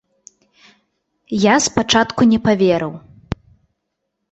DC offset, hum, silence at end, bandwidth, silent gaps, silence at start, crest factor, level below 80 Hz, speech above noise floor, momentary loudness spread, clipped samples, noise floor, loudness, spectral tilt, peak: under 0.1%; none; 1 s; 8.2 kHz; none; 1.3 s; 18 dB; -46 dBFS; 60 dB; 17 LU; under 0.1%; -75 dBFS; -15 LUFS; -4 dB/octave; 0 dBFS